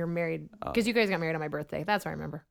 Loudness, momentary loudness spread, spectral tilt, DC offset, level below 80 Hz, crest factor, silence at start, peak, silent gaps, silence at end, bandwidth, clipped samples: -31 LUFS; 10 LU; -5.5 dB/octave; under 0.1%; -58 dBFS; 18 dB; 0 s; -14 dBFS; none; 0.1 s; 18.5 kHz; under 0.1%